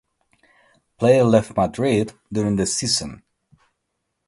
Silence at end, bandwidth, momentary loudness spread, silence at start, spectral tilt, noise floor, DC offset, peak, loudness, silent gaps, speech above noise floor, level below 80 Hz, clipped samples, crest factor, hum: 1.1 s; 11.5 kHz; 9 LU; 1 s; -5 dB/octave; -76 dBFS; under 0.1%; -2 dBFS; -20 LUFS; none; 57 dB; -50 dBFS; under 0.1%; 20 dB; none